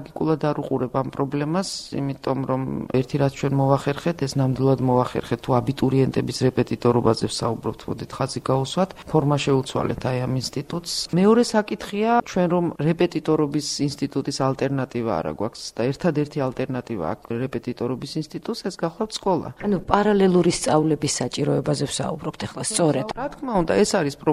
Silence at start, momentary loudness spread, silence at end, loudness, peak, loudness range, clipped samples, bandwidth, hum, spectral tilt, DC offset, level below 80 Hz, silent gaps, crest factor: 0 s; 9 LU; 0 s; -23 LUFS; 0 dBFS; 5 LU; under 0.1%; 14.5 kHz; none; -5.5 dB/octave; under 0.1%; -50 dBFS; none; 22 dB